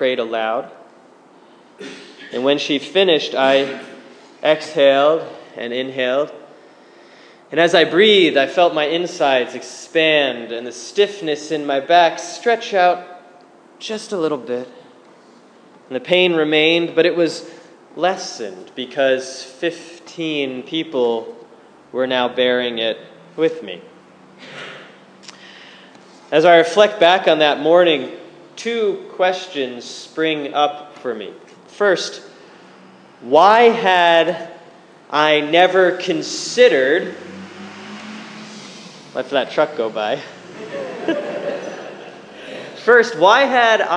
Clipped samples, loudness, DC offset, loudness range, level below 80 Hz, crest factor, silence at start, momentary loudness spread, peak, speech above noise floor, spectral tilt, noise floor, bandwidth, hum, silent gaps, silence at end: under 0.1%; -16 LUFS; under 0.1%; 8 LU; -72 dBFS; 18 dB; 0 s; 22 LU; 0 dBFS; 31 dB; -3.5 dB/octave; -47 dBFS; 10 kHz; none; none; 0 s